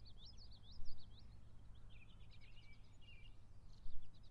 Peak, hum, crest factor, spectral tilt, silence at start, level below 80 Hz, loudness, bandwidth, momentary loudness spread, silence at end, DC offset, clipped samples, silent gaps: -30 dBFS; none; 16 dB; -5 dB/octave; 0 s; -58 dBFS; -63 LUFS; 6.2 kHz; 5 LU; 0 s; under 0.1%; under 0.1%; none